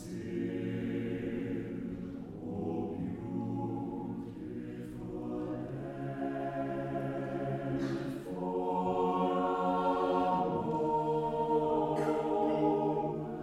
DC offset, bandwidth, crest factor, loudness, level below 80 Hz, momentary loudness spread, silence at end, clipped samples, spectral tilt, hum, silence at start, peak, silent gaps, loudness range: under 0.1%; 13.5 kHz; 16 dB; -34 LUFS; -60 dBFS; 11 LU; 0 s; under 0.1%; -8.5 dB/octave; none; 0 s; -18 dBFS; none; 8 LU